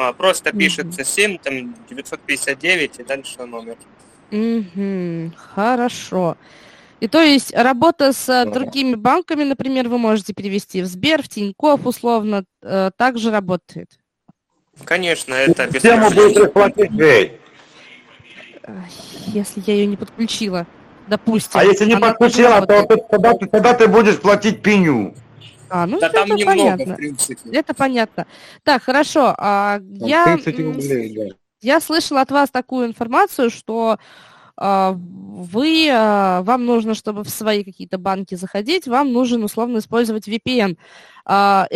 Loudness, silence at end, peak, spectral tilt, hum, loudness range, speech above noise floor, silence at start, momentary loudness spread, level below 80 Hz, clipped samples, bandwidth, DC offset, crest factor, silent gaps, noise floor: -16 LUFS; 0 s; 0 dBFS; -4.5 dB/octave; none; 8 LU; 40 dB; 0 s; 15 LU; -54 dBFS; under 0.1%; 14 kHz; under 0.1%; 16 dB; none; -56 dBFS